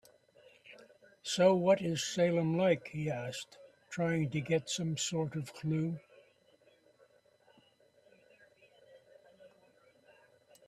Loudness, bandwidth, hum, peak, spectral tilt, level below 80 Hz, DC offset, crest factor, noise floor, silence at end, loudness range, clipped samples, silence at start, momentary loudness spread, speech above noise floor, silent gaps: -33 LUFS; 13.5 kHz; none; -16 dBFS; -5 dB/octave; -74 dBFS; under 0.1%; 20 dB; -67 dBFS; 1.2 s; 11 LU; under 0.1%; 0.7 s; 17 LU; 35 dB; none